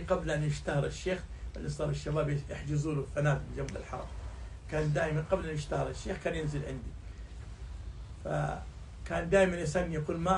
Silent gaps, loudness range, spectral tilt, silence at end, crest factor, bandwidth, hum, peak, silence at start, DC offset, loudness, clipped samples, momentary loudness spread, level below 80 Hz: none; 4 LU; -6.5 dB/octave; 0 s; 20 dB; 11 kHz; none; -14 dBFS; 0 s; under 0.1%; -34 LUFS; under 0.1%; 15 LU; -44 dBFS